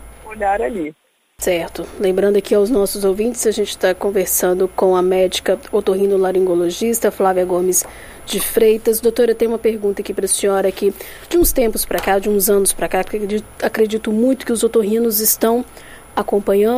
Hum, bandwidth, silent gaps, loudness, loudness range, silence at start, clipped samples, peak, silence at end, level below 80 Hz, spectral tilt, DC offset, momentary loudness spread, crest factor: none; 15.5 kHz; none; -17 LUFS; 1 LU; 0 s; under 0.1%; 0 dBFS; 0 s; -38 dBFS; -3.5 dB/octave; under 0.1%; 8 LU; 16 dB